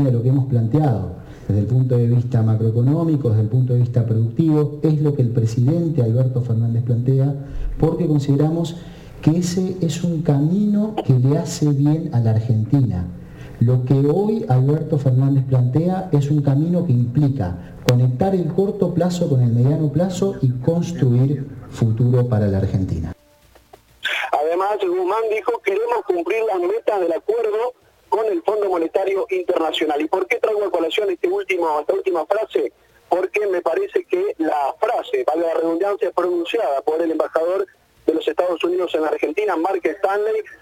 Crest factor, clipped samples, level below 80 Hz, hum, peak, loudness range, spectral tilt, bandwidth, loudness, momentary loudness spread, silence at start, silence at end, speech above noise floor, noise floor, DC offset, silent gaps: 18 dB; under 0.1%; -42 dBFS; none; 0 dBFS; 3 LU; -8 dB/octave; 12 kHz; -19 LUFS; 5 LU; 0 s; 0.05 s; 34 dB; -52 dBFS; under 0.1%; none